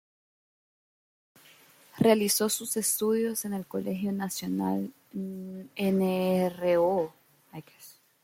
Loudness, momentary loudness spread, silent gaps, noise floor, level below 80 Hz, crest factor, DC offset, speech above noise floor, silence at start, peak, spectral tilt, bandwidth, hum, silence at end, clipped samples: -28 LUFS; 15 LU; none; -57 dBFS; -70 dBFS; 22 dB; under 0.1%; 29 dB; 1.95 s; -8 dBFS; -4.5 dB/octave; 16.5 kHz; none; 0.3 s; under 0.1%